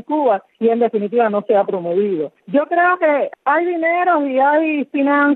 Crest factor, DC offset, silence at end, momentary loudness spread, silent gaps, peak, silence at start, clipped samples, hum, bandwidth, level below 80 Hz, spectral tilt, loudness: 12 dB; under 0.1%; 0 s; 4 LU; none; -4 dBFS; 0.1 s; under 0.1%; none; 4.2 kHz; -80 dBFS; -9.5 dB/octave; -17 LUFS